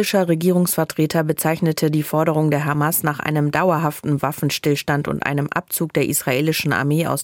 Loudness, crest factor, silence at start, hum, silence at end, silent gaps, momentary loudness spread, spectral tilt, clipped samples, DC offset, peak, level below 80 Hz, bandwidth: -19 LUFS; 16 dB; 0 s; none; 0 s; none; 4 LU; -5 dB/octave; under 0.1%; under 0.1%; -2 dBFS; -56 dBFS; 17 kHz